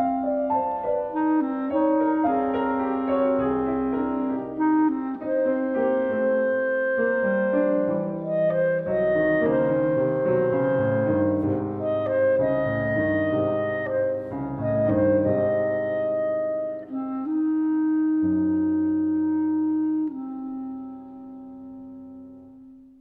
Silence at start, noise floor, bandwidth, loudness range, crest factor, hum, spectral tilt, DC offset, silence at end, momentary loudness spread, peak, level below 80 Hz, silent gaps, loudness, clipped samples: 0 s; -47 dBFS; 4 kHz; 2 LU; 14 dB; none; -11 dB/octave; under 0.1%; 0.2 s; 10 LU; -10 dBFS; -56 dBFS; none; -24 LUFS; under 0.1%